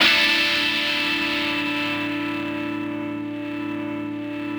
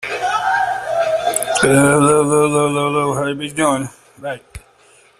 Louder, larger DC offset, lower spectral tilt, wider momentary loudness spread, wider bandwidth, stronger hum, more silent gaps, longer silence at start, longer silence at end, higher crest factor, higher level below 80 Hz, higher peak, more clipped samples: second, -22 LUFS vs -16 LUFS; neither; second, -3 dB/octave vs -4.5 dB/octave; second, 12 LU vs 17 LU; first, over 20 kHz vs 15.5 kHz; neither; neither; about the same, 0 s vs 0 s; second, 0 s vs 0.6 s; about the same, 20 dB vs 16 dB; second, -58 dBFS vs -48 dBFS; second, -4 dBFS vs 0 dBFS; neither